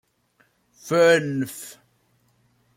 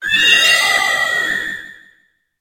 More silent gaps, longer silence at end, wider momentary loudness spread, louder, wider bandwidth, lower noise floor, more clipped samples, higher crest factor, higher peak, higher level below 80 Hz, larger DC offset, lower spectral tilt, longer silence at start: neither; first, 1.05 s vs 0.7 s; first, 23 LU vs 14 LU; second, -21 LUFS vs -12 LUFS; about the same, 16.5 kHz vs 16.5 kHz; first, -65 dBFS vs -58 dBFS; neither; about the same, 18 dB vs 16 dB; second, -6 dBFS vs 0 dBFS; second, -70 dBFS vs -54 dBFS; neither; first, -4.5 dB/octave vs 1 dB/octave; first, 0.85 s vs 0 s